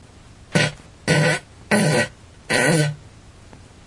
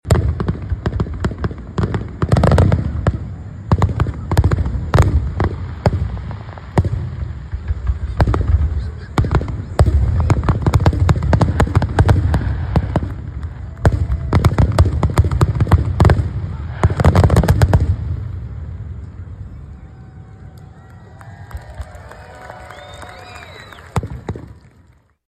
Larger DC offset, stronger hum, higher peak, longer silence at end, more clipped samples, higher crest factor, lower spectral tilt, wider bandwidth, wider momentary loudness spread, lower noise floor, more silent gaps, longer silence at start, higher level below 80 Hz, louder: neither; neither; about the same, -2 dBFS vs 0 dBFS; second, 0.3 s vs 0.8 s; neither; about the same, 20 dB vs 16 dB; second, -4.5 dB/octave vs -7.5 dB/octave; second, 11.5 kHz vs 13 kHz; second, 9 LU vs 20 LU; second, -45 dBFS vs -51 dBFS; neither; first, 0.5 s vs 0.05 s; second, -50 dBFS vs -22 dBFS; second, -20 LUFS vs -17 LUFS